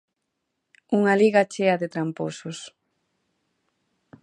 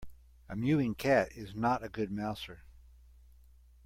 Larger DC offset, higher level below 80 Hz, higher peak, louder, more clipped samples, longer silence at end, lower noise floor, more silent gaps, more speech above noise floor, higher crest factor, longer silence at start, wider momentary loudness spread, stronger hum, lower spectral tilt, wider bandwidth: neither; second, -76 dBFS vs -56 dBFS; first, -6 dBFS vs -16 dBFS; first, -22 LUFS vs -33 LUFS; neither; first, 1.55 s vs 1.15 s; first, -79 dBFS vs -59 dBFS; neither; first, 57 dB vs 27 dB; about the same, 20 dB vs 20 dB; first, 0.9 s vs 0 s; first, 18 LU vs 15 LU; neither; about the same, -6 dB/octave vs -7 dB/octave; second, 11 kHz vs 16.5 kHz